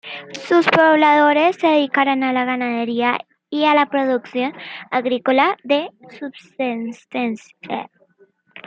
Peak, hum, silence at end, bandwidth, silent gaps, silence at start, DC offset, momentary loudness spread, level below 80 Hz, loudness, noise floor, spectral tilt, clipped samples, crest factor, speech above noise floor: -2 dBFS; none; 0.05 s; 8 kHz; none; 0.05 s; under 0.1%; 18 LU; -72 dBFS; -18 LUFS; -56 dBFS; -5 dB/octave; under 0.1%; 18 dB; 39 dB